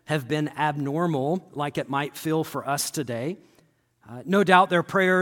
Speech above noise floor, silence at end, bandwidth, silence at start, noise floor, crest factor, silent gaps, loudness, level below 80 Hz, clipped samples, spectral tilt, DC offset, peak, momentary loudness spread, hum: 38 dB; 0 s; 17.5 kHz; 0.1 s; -62 dBFS; 22 dB; none; -24 LUFS; -70 dBFS; under 0.1%; -5 dB/octave; under 0.1%; -2 dBFS; 13 LU; none